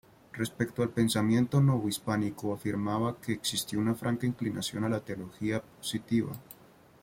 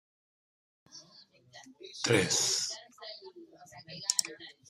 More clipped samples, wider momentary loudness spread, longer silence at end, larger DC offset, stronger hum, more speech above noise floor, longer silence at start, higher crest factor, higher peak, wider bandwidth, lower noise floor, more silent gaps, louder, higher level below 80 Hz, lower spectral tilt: neither; second, 10 LU vs 26 LU; first, 0.5 s vs 0.2 s; neither; neither; about the same, 27 dB vs 28 dB; second, 0.35 s vs 0.95 s; second, 18 dB vs 28 dB; second, -14 dBFS vs -8 dBFS; about the same, 16.5 kHz vs 15 kHz; about the same, -58 dBFS vs -60 dBFS; neither; about the same, -31 LUFS vs -29 LUFS; first, -62 dBFS vs -74 dBFS; first, -5.5 dB/octave vs -2 dB/octave